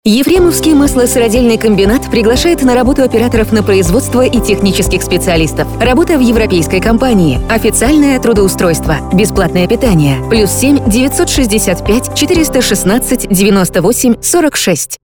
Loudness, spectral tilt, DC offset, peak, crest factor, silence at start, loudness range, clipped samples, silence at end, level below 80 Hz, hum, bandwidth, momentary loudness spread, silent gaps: -9 LUFS; -4.5 dB/octave; under 0.1%; 0 dBFS; 8 dB; 0.05 s; 1 LU; under 0.1%; 0.1 s; -22 dBFS; none; over 20 kHz; 3 LU; none